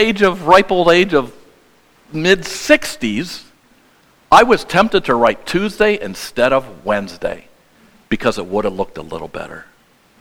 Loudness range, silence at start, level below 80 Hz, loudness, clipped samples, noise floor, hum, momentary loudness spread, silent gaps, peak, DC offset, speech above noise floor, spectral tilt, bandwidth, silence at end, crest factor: 7 LU; 0 s; -42 dBFS; -15 LUFS; 0.1%; -52 dBFS; none; 18 LU; none; 0 dBFS; under 0.1%; 37 dB; -4.5 dB/octave; 17.5 kHz; 0.6 s; 16 dB